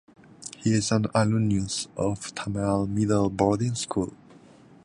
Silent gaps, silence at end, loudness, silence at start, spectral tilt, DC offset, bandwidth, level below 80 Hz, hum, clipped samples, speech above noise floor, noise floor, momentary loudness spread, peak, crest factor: none; 0.7 s; -26 LUFS; 0.4 s; -5.5 dB/octave; under 0.1%; 11 kHz; -50 dBFS; none; under 0.1%; 27 dB; -52 dBFS; 9 LU; -8 dBFS; 18 dB